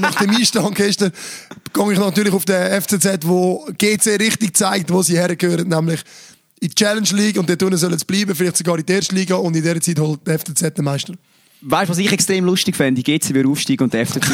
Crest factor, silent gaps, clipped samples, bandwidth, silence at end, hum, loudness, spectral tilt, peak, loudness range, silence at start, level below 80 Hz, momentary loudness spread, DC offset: 16 dB; none; under 0.1%; over 20 kHz; 0 s; none; -16 LUFS; -4 dB/octave; 0 dBFS; 2 LU; 0 s; -60 dBFS; 5 LU; under 0.1%